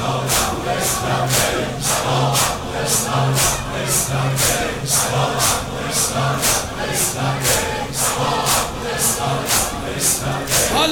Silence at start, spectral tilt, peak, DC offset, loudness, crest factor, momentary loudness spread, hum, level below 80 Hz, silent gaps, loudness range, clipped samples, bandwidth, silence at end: 0 s; -2.5 dB/octave; -4 dBFS; under 0.1%; -18 LUFS; 16 dB; 4 LU; none; -36 dBFS; none; 1 LU; under 0.1%; over 20 kHz; 0 s